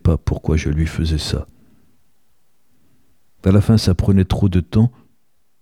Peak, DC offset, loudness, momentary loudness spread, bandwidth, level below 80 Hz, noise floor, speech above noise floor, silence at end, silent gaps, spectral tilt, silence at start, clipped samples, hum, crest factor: -2 dBFS; 0.3%; -18 LUFS; 8 LU; 13.5 kHz; -28 dBFS; -68 dBFS; 52 dB; 0.7 s; none; -7 dB/octave; 0.05 s; under 0.1%; none; 18 dB